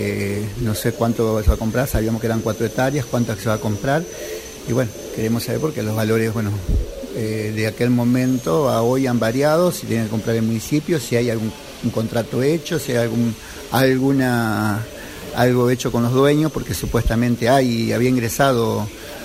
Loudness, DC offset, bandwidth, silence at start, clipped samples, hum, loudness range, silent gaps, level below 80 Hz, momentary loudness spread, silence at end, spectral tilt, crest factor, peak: -20 LUFS; under 0.1%; 16 kHz; 0 s; under 0.1%; none; 4 LU; none; -32 dBFS; 8 LU; 0 s; -6 dB/octave; 16 dB; -2 dBFS